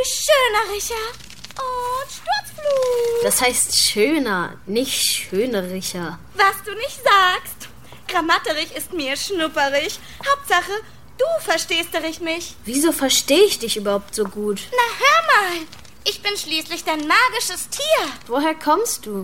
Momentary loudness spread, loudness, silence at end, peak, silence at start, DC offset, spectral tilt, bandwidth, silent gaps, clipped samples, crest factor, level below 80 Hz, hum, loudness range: 12 LU; -19 LUFS; 0 s; -2 dBFS; 0 s; 0.8%; -1.5 dB/octave; 16.5 kHz; none; under 0.1%; 18 dB; -52 dBFS; none; 3 LU